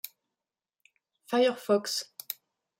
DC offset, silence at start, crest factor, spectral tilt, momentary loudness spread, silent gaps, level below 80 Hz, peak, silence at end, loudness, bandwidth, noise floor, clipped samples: under 0.1%; 1.3 s; 20 dB; -3 dB/octave; 14 LU; none; -88 dBFS; -12 dBFS; 0.45 s; -30 LUFS; 16.5 kHz; under -90 dBFS; under 0.1%